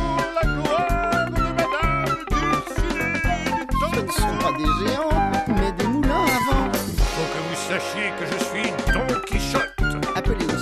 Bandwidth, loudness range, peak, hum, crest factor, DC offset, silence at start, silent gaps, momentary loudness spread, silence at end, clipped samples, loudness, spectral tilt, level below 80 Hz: 14 kHz; 2 LU; -6 dBFS; none; 14 dB; under 0.1%; 0 s; none; 4 LU; 0 s; under 0.1%; -22 LUFS; -5 dB/octave; -28 dBFS